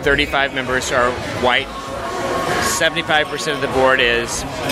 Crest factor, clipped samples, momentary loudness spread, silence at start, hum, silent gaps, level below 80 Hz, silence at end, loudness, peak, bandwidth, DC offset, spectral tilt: 18 dB; under 0.1%; 8 LU; 0 s; none; none; -38 dBFS; 0 s; -17 LUFS; 0 dBFS; 16 kHz; under 0.1%; -3 dB/octave